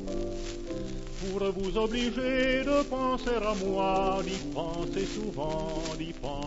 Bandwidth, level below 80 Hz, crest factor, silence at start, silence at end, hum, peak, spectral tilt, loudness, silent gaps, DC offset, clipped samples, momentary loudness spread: 8 kHz; -40 dBFS; 14 dB; 0 s; 0 s; none; -16 dBFS; -5 dB/octave; -31 LUFS; none; under 0.1%; under 0.1%; 10 LU